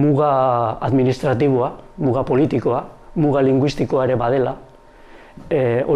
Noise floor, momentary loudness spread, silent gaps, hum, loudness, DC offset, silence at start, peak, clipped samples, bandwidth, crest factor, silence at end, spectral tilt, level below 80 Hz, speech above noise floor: -43 dBFS; 8 LU; none; none; -18 LUFS; under 0.1%; 0 s; -6 dBFS; under 0.1%; 10.5 kHz; 12 dB; 0 s; -8.5 dB/octave; -44 dBFS; 26 dB